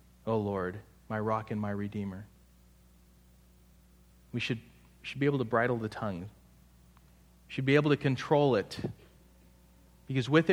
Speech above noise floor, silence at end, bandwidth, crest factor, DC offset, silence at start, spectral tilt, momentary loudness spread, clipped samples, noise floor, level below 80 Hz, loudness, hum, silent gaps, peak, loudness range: 30 dB; 0 s; 15 kHz; 24 dB; under 0.1%; 0.25 s; -7 dB/octave; 16 LU; under 0.1%; -60 dBFS; -62 dBFS; -32 LUFS; 60 Hz at -60 dBFS; none; -10 dBFS; 9 LU